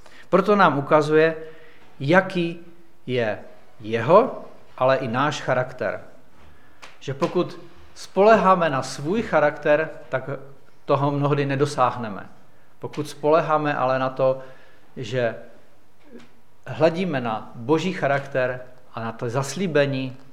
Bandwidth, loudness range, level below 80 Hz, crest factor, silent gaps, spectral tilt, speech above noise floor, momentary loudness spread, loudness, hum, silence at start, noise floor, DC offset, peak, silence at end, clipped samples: 14 kHz; 5 LU; -62 dBFS; 22 dB; none; -6 dB/octave; 35 dB; 19 LU; -22 LUFS; none; 0.3 s; -56 dBFS; 1%; -2 dBFS; 0.15 s; under 0.1%